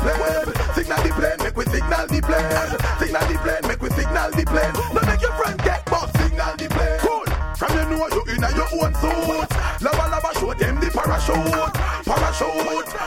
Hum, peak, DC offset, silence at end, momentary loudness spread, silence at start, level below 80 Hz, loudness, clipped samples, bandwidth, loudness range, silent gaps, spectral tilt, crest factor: none; -4 dBFS; under 0.1%; 0 s; 3 LU; 0 s; -26 dBFS; -21 LUFS; under 0.1%; 17 kHz; 1 LU; none; -5 dB/octave; 16 dB